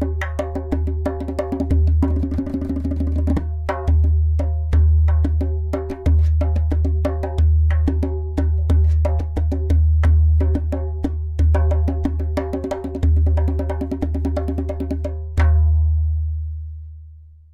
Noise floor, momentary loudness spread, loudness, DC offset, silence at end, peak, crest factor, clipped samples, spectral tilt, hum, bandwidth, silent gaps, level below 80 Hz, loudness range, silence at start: -42 dBFS; 8 LU; -20 LUFS; under 0.1%; 0.25 s; -8 dBFS; 10 dB; under 0.1%; -9.5 dB/octave; none; 3.8 kHz; none; -20 dBFS; 3 LU; 0 s